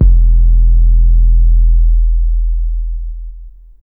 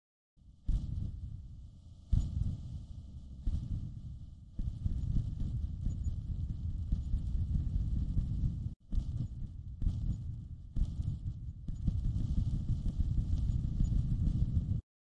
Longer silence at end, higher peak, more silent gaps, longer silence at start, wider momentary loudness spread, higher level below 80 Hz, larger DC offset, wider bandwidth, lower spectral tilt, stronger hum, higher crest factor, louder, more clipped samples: about the same, 0.4 s vs 0.3 s; first, 0 dBFS vs -18 dBFS; second, none vs 8.76-8.80 s; second, 0 s vs 0.45 s; about the same, 13 LU vs 12 LU; first, -8 dBFS vs -38 dBFS; neither; second, 0.4 kHz vs 7.6 kHz; first, -13.5 dB/octave vs -9 dB/octave; neither; second, 8 dB vs 18 dB; first, -14 LUFS vs -38 LUFS; neither